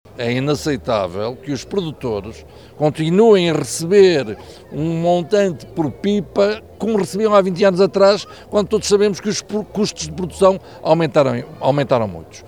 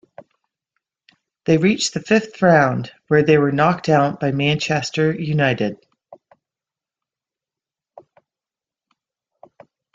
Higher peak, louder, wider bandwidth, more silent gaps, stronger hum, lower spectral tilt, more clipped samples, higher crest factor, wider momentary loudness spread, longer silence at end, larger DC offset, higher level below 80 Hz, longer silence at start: about the same, -2 dBFS vs -2 dBFS; about the same, -17 LUFS vs -18 LUFS; first, 16 kHz vs 8.8 kHz; neither; neither; about the same, -5.5 dB/octave vs -5.5 dB/octave; neither; about the same, 16 dB vs 18 dB; first, 12 LU vs 6 LU; second, 0 s vs 3.8 s; first, 0.2% vs under 0.1%; first, -46 dBFS vs -58 dBFS; second, 0.2 s vs 1.45 s